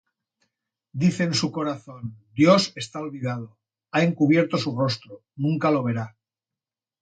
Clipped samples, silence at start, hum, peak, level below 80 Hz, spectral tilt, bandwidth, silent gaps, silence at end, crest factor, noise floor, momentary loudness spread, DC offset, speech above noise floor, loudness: under 0.1%; 0.95 s; none; -4 dBFS; -64 dBFS; -6 dB/octave; 9.2 kHz; none; 0.95 s; 22 dB; -90 dBFS; 16 LU; under 0.1%; 67 dB; -23 LUFS